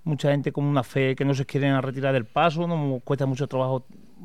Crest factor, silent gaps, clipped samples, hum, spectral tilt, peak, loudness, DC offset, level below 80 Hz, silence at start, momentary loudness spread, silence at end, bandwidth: 16 dB; none; under 0.1%; none; -7.5 dB/octave; -8 dBFS; -25 LUFS; 0.4%; -60 dBFS; 0.05 s; 4 LU; 0 s; 11.5 kHz